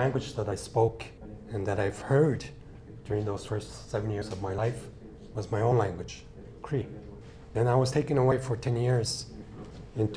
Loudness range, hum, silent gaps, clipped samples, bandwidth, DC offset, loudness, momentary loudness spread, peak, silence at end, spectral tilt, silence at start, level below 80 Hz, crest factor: 4 LU; none; none; under 0.1%; 11 kHz; under 0.1%; -30 LUFS; 20 LU; -12 dBFS; 0 s; -6.5 dB/octave; 0 s; -50 dBFS; 18 dB